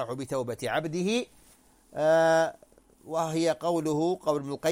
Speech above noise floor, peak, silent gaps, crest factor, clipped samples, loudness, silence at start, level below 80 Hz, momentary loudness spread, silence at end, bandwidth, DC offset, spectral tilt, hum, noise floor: 32 dB; -12 dBFS; none; 16 dB; under 0.1%; -28 LUFS; 0 s; -66 dBFS; 10 LU; 0 s; 16.5 kHz; under 0.1%; -5 dB/octave; none; -59 dBFS